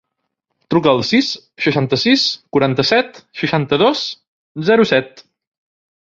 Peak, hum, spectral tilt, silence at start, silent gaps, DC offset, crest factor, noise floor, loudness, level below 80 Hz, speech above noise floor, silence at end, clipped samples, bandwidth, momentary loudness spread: 0 dBFS; none; -5.5 dB/octave; 0.7 s; 4.27-4.55 s; under 0.1%; 16 dB; -74 dBFS; -16 LUFS; -54 dBFS; 58 dB; 0.85 s; under 0.1%; 7.6 kHz; 11 LU